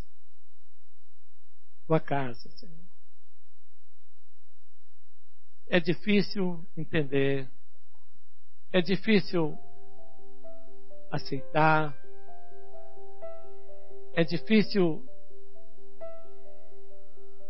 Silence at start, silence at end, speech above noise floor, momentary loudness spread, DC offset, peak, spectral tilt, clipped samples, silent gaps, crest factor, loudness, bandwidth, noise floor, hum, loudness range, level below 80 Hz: 1.9 s; 1.3 s; 50 dB; 24 LU; 5%; -8 dBFS; -10 dB/octave; under 0.1%; none; 24 dB; -28 LUFS; 5.8 kHz; -77 dBFS; none; 6 LU; -64 dBFS